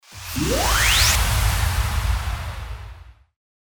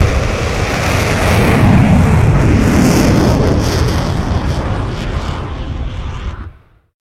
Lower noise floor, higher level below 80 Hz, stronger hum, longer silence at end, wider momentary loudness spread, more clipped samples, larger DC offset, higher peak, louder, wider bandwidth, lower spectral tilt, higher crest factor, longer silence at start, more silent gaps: first, -42 dBFS vs -36 dBFS; second, -26 dBFS vs -20 dBFS; neither; about the same, 0.55 s vs 0.5 s; first, 18 LU vs 13 LU; neither; neither; second, -4 dBFS vs 0 dBFS; second, -20 LUFS vs -13 LUFS; first, over 20 kHz vs 16 kHz; second, -2.5 dB/octave vs -6 dB/octave; about the same, 16 dB vs 12 dB; about the same, 0.1 s vs 0 s; neither